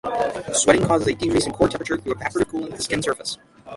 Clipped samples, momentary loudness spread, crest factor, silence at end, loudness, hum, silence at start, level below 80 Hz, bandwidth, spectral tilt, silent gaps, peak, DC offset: under 0.1%; 10 LU; 22 dB; 0 s; -22 LUFS; none; 0.05 s; -46 dBFS; 11.5 kHz; -4 dB/octave; none; 0 dBFS; under 0.1%